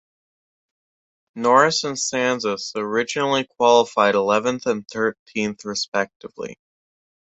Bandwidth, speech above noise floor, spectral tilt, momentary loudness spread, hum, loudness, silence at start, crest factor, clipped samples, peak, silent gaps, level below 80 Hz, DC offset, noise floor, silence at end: 8.4 kHz; over 69 dB; -3 dB/octave; 10 LU; none; -20 LUFS; 1.35 s; 20 dB; under 0.1%; -2 dBFS; 5.19-5.26 s, 5.88-5.92 s, 6.16-6.20 s; -66 dBFS; under 0.1%; under -90 dBFS; 0.7 s